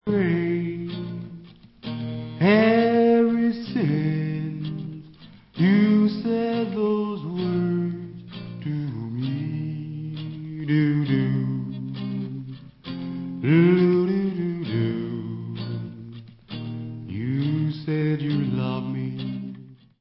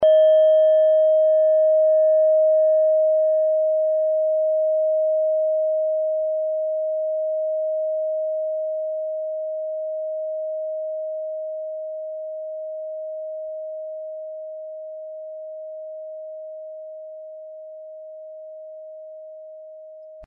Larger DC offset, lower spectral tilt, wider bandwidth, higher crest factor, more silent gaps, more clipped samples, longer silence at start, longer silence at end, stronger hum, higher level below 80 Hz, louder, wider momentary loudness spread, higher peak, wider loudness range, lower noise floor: neither; first, -12 dB/octave vs -1.5 dB/octave; first, 5.8 kHz vs 3.4 kHz; first, 18 dB vs 12 dB; neither; neither; about the same, 0.05 s vs 0 s; first, 0.25 s vs 0 s; neither; first, -58 dBFS vs -76 dBFS; second, -24 LUFS vs -21 LUFS; second, 18 LU vs 22 LU; first, -6 dBFS vs -10 dBFS; second, 7 LU vs 19 LU; first, -47 dBFS vs -41 dBFS